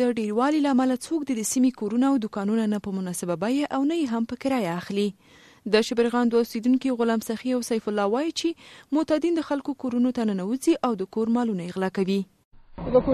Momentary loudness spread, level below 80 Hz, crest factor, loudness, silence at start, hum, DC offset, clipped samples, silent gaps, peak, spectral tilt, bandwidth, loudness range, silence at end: 6 LU; -54 dBFS; 18 dB; -25 LUFS; 0 s; none; under 0.1%; under 0.1%; 12.45-12.51 s; -8 dBFS; -5 dB/octave; 13.5 kHz; 2 LU; 0 s